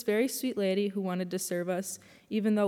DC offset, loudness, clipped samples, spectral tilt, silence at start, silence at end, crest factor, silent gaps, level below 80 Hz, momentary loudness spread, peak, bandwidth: under 0.1%; -31 LUFS; under 0.1%; -5 dB/octave; 0 s; 0 s; 14 dB; none; -82 dBFS; 7 LU; -16 dBFS; 17.5 kHz